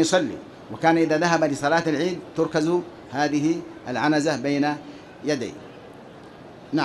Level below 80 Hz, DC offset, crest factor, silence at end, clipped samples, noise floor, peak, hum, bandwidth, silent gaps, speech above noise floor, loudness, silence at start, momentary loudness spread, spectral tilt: -62 dBFS; under 0.1%; 20 dB; 0 s; under 0.1%; -43 dBFS; -4 dBFS; none; 12 kHz; none; 21 dB; -23 LUFS; 0 s; 23 LU; -5 dB/octave